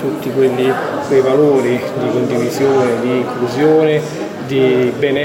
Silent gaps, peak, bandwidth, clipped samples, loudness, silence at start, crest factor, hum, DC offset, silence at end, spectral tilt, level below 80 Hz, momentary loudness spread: none; 0 dBFS; 16.5 kHz; under 0.1%; -14 LUFS; 0 s; 12 dB; none; under 0.1%; 0 s; -6.5 dB/octave; -56 dBFS; 7 LU